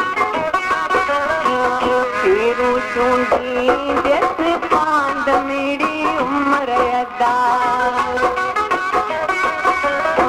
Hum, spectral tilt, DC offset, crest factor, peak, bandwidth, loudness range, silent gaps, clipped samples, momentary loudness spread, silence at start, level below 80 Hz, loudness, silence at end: none; -4 dB/octave; under 0.1%; 16 dB; -2 dBFS; 15.5 kHz; 1 LU; none; under 0.1%; 3 LU; 0 s; -46 dBFS; -17 LUFS; 0 s